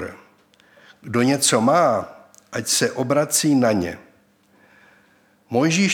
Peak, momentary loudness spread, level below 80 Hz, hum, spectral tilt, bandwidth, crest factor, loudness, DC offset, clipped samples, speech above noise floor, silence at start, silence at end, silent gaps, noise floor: -2 dBFS; 14 LU; -62 dBFS; none; -4 dB/octave; 18.5 kHz; 18 dB; -19 LUFS; under 0.1%; under 0.1%; 39 dB; 0 s; 0 s; none; -58 dBFS